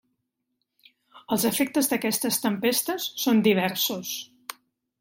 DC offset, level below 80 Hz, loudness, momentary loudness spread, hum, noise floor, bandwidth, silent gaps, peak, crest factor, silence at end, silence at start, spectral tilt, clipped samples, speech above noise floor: under 0.1%; -70 dBFS; -24 LUFS; 12 LU; none; -79 dBFS; 16.5 kHz; none; -8 dBFS; 18 dB; 0.5 s; 1.15 s; -3.5 dB/octave; under 0.1%; 55 dB